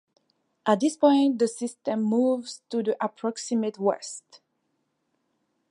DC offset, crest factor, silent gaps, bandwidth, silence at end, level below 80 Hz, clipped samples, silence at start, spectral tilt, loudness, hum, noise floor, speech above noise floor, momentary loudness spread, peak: under 0.1%; 20 dB; none; 11.5 kHz; 1.5 s; -84 dBFS; under 0.1%; 0.65 s; -5 dB/octave; -25 LUFS; none; -75 dBFS; 51 dB; 11 LU; -6 dBFS